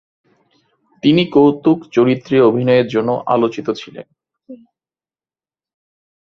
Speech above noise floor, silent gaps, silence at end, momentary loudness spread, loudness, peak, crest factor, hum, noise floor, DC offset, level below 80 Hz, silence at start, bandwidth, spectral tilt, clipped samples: over 76 dB; none; 1.75 s; 11 LU; -15 LUFS; 0 dBFS; 16 dB; none; under -90 dBFS; under 0.1%; -58 dBFS; 1.05 s; 7 kHz; -7.5 dB/octave; under 0.1%